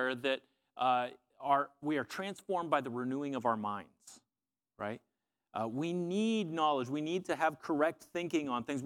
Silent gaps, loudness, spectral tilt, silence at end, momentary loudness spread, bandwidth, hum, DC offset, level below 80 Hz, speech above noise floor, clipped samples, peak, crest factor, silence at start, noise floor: none; -35 LUFS; -5.5 dB/octave; 0 s; 10 LU; 16.5 kHz; none; under 0.1%; -80 dBFS; over 55 dB; under 0.1%; -16 dBFS; 20 dB; 0 s; under -90 dBFS